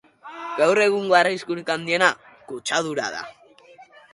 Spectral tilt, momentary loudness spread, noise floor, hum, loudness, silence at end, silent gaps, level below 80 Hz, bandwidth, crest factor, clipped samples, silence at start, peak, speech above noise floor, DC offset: -3 dB/octave; 19 LU; -49 dBFS; none; -21 LUFS; 0.3 s; none; -70 dBFS; 11.5 kHz; 22 dB; under 0.1%; 0.25 s; -2 dBFS; 28 dB; under 0.1%